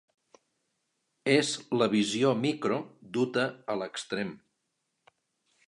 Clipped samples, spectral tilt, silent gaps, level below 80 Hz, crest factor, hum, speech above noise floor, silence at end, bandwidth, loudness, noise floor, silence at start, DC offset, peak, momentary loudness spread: under 0.1%; -4.5 dB/octave; none; -76 dBFS; 22 dB; none; 52 dB; 1.3 s; 11.5 kHz; -29 LUFS; -80 dBFS; 1.25 s; under 0.1%; -8 dBFS; 9 LU